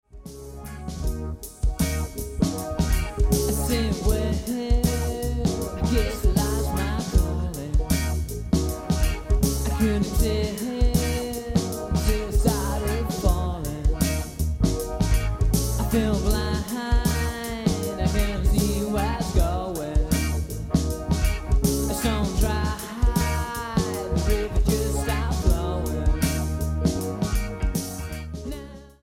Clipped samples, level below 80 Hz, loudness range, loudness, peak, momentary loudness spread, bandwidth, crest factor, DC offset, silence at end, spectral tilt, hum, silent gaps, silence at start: under 0.1%; -26 dBFS; 1 LU; -25 LUFS; -6 dBFS; 6 LU; 17 kHz; 18 dB; under 0.1%; 0.15 s; -5.5 dB/octave; none; none; 0.15 s